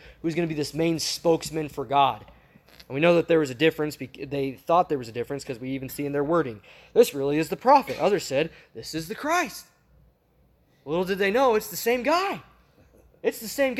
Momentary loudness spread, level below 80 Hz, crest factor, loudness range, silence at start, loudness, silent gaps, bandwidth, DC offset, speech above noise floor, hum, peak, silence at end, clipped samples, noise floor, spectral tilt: 12 LU; -58 dBFS; 20 dB; 3 LU; 0.05 s; -25 LUFS; none; 16.5 kHz; under 0.1%; 38 dB; none; -6 dBFS; 0 s; under 0.1%; -63 dBFS; -4.5 dB/octave